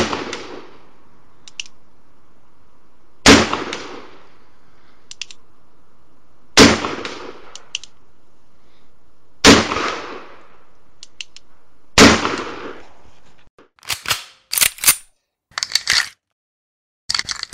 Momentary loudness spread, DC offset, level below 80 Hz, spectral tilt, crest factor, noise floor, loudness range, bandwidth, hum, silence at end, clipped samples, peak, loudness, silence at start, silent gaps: 25 LU; 2%; -40 dBFS; -2.5 dB/octave; 20 dB; -58 dBFS; 3 LU; 16 kHz; none; 0 s; under 0.1%; 0 dBFS; -14 LUFS; 0 s; 13.50-13.58 s, 16.32-17.09 s